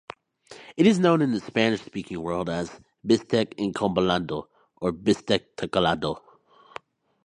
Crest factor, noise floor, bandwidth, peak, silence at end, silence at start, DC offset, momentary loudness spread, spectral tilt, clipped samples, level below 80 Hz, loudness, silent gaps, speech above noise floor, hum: 20 dB; -50 dBFS; 10.5 kHz; -4 dBFS; 1.05 s; 0.5 s; under 0.1%; 19 LU; -6 dB/octave; under 0.1%; -56 dBFS; -25 LUFS; none; 26 dB; none